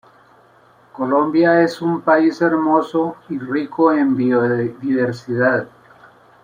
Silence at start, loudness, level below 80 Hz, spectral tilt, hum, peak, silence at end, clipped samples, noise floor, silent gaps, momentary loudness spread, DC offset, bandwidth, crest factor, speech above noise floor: 0.95 s; -17 LUFS; -64 dBFS; -7.5 dB/octave; none; -2 dBFS; 0.75 s; under 0.1%; -51 dBFS; none; 9 LU; under 0.1%; 9.6 kHz; 16 dB; 34 dB